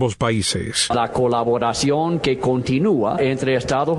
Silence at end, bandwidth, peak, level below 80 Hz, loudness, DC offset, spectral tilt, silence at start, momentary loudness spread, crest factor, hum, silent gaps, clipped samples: 0 s; 12.5 kHz; -4 dBFS; -44 dBFS; -19 LUFS; under 0.1%; -5 dB/octave; 0 s; 2 LU; 14 dB; none; none; under 0.1%